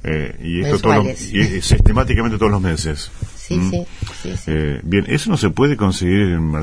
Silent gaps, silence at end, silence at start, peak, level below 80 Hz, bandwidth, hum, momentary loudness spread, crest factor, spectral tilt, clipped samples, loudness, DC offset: none; 0 s; 0 s; 0 dBFS; -24 dBFS; 11 kHz; none; 11 LU; 16 dB; -6 dB/octave; under 0.1%; -17 LUFS; under 0.1%